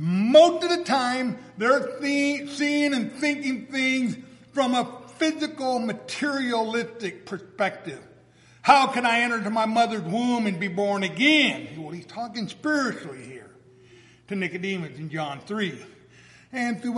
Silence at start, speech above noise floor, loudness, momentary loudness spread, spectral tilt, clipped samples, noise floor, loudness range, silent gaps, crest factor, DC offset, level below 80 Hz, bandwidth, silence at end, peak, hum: 0 s; 30 dB; -24 LUFS; 17 LU; -4.5 dB/octave; under 0.1%; -54 dBFS; 9 LU; none; 22 dB; under 0.1%; -72 dBFS; 11.5 kHz; 0 s; -2 dBFS; none